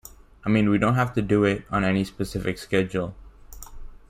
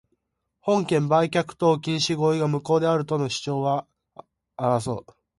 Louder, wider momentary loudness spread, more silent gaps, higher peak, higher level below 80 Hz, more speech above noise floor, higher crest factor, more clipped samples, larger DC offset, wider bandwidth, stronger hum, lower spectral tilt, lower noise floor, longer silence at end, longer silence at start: about the same, -24 LUFS vs -24 LUFS; first, 14 LU vs 7 LU; neither; about the same, -8 dBFS vs -8 dBFS; first, -44 dBFS vs -62 dBFS; second, 20 dB vs 53 dB; about the same, 18 dB vs 16 dB; neither; neither; first, 16 kHz vs 11.5 kHz; neither; first, -7 dB/octave vs -5.5 dB/octave; second, -43 dBFS vs -76 dBFS; second, 0.15 s vs 0.4 s; second, 0.05 s vs 0.65 s